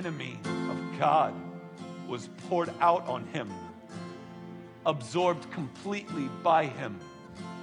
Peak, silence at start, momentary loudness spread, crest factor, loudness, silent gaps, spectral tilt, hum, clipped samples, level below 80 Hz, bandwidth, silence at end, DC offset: -12 dBFS; 0 s; 18 LU; 20 dB; -30 LUFS; none; -6 dB/octave; none; under 0.1%; -74 dBFS; 11 kHz; 0 s; under 0.1%